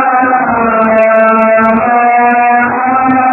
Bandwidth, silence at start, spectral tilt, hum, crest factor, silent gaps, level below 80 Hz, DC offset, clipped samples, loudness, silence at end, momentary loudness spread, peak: 4 kHz; 0 s; -10 dB/octave; none; 8 dB; none; -44 dBFS; under 0.1%; 0.2%; -8 LUFS; 0 s; 3 LU; 0 dBFS